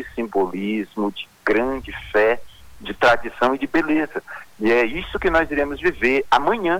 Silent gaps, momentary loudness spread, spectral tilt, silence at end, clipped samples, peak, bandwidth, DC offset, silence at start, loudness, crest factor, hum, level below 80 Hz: none; 10 LU; -5.5 dB/octave; 0 s; under 0.1%; -4 dBFS; 19 kHz; under 0.1%; 0 s; -20 LUFS; 16 dB; none; -42 dBFS